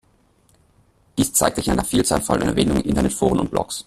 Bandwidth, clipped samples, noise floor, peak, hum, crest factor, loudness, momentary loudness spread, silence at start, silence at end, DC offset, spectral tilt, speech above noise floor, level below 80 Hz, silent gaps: 15 kHz; under 0.1%; -59 dBFS; 0 dBFS; none; 20 dB; -20 LUFS; 4 LU; 1.15 s; 0.05 s; under 0.1%; -4.5 dB/octave; 39 dB; -36 dBFS; none